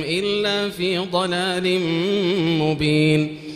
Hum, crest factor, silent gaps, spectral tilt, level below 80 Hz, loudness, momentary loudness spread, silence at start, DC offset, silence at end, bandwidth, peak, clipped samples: none; 16 dB; none; -5.5 dB/octave; -52 dBFS; -20 LUFS; 4 LU; 0 s; under 0.1%; 0 s; 14.5 kHz; -4 dBFS; under 0.1%